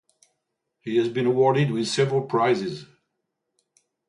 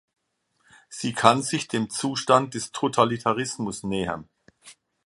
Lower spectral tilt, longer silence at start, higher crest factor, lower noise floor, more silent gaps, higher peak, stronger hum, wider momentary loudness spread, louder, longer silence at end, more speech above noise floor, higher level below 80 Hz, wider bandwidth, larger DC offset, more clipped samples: first, -6 dB/octave vs -4 dB/octave; about the same, 0.85 s vs 0.9 s; second, 16 dB vs 26 dB; first, -79 dBFS vs -72 dBFS; neither; second, -8 dBFS vs 0 dBFS; neither; about the same, 12 LU vs 11 LU; about the same, -23 LUFS vs -24 LUFS; first, 1.25 s vs 0.35 s; first, 57 dB vs 48 dB; second, -68 dBFS vs -60 dBFS; about the same, 11 kHz vs 11.5 kHz; neither; neither